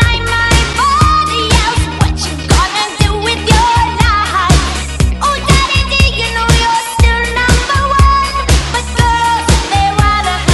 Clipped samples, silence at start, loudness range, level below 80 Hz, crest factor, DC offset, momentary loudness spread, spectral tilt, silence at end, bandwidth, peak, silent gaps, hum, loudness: 0.3%; 0 s; 1 LU; -16 dBFS; 10 dB; under 0.1%; 4 LU; -4 dB/octave; 0 s; 12 kHz; 0 dBFS; none; none; -11 LUFS